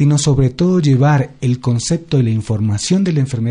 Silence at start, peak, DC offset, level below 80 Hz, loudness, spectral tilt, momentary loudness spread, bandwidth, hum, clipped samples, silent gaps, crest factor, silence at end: 0 s; -2 dBFS; under 0.1%; -40 dBFS; -15 LUFS; -6.5 dB/octave; 5 LU; 10.5 kHz; none; under 0.1%; none; 12 dB; 0 s